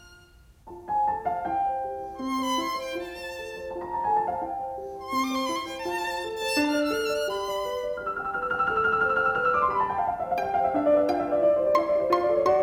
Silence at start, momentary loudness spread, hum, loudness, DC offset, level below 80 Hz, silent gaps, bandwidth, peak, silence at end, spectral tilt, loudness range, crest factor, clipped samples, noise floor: 0.05 s; 11 LU; none; -26 LUFS; under 0.1%; -56 dBFS; none; 18 kHz; -10 dBFS; 0 s; -4 dB/octave; 6 LU; 18 dB; under 0.1%; -54 dBFS